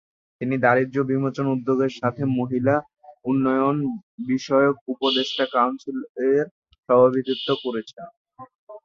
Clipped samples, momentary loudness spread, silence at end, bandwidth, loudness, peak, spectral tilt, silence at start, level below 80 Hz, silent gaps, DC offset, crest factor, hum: under 0.1%; 12 LU; 0.05 s; 7.2 kHz; -22 LUFS; -4 dBFS; -6.5 dB/octave; 0.4 s; -64 dBFS; 4.03-4.18 s, 4.81-4.86 s, 6.09-6.15 s, 6.51-6.62 s, 6.78-6.83 s, 8.17-8.25 s, 8.55-8.67 s; under 0.1%; 20 dB; none